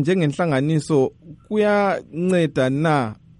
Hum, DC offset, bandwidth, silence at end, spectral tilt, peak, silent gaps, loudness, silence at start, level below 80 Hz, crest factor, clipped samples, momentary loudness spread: none; under 0.1%; 11 kHz; 0.25 s; -7 dB/octave; -6 dBFS; none; -20 LUFS; 0 s; -56 dBFS; 14 dB; under 0.1%; 4 LU